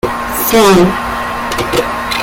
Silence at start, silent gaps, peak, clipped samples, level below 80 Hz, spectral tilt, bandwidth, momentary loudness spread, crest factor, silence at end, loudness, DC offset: 0.05 s; none; 0 dBFS; under 0.1%; -32 dBFS; -4 dB/octave; 17 kHz; 10 LU; 12 dB; 0 s; -12 LUFS; under 0.1%